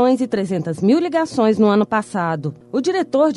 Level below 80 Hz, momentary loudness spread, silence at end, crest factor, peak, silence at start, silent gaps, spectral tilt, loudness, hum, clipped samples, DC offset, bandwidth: -62 dBFS; 7 LU; 0 s; 12 dB; -4 dBFS; 0 s; none; -6.5 dB/octave; -18 LUFS; none; under 0.1%; under 0.1%; 11.5 kHz